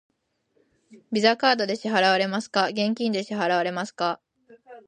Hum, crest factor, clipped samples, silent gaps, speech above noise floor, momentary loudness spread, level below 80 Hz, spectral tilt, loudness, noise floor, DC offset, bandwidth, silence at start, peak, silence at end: none; 20 dB; under 0.1%; none; 47 dB; 8 LU; -78 dBFS; -4.5 dB/octave; -23 LUFS; -70 dBFS; under 0.1%; 9.8 kHz; 0.9 s; -6 dBFS; 0.1 s